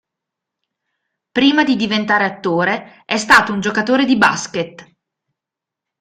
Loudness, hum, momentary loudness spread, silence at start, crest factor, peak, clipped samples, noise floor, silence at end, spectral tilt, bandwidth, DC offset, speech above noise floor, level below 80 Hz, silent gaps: -15 LUFS; none; 12 LU; 1.35 s; 18 dB; 0 dBFS; under 0.1%; -85 dBFS; 1.2 s; -4 dB/octave; 15 kHz; under 0.1%; 69 dB; -56 dBFS; none